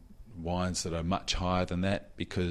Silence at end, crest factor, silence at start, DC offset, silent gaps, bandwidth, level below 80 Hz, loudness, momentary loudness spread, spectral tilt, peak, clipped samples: 0 s; 16 dB; 0 s; under 0.1%; none; 13 kHz; -44 dBFS; -32 LUFS; 7 LU; -5 dB/octave; -16 dBFS; under 0.1%